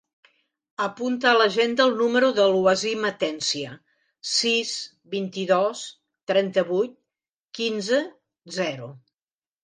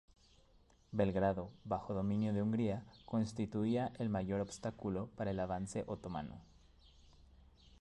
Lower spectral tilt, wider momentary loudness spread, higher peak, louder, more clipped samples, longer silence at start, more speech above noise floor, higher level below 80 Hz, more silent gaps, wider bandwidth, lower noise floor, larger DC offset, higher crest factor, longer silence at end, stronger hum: second, -3.5 dB/octave vs -7.5 dB/octave; first, 17 LU vs 8 LU; first, -6 dBFS vs -22 dBFS; first, -23 LUFS vs -39 LUFS; neither; about the same, 0.8 s vs 0.9 s; first, over 67 dB vs 30 dB; second, -72 dBFS vs -60 dBFS; first, 6.23-6.27 s, 7.29-7.48 s vs none; about the same, 10 kHz vs 11 kHz; first, under -90 dBFS vs -68 dBFS; neither; about the same, 20 dB vs 18 dB; first, 0.65 s vs 0.1 s; neither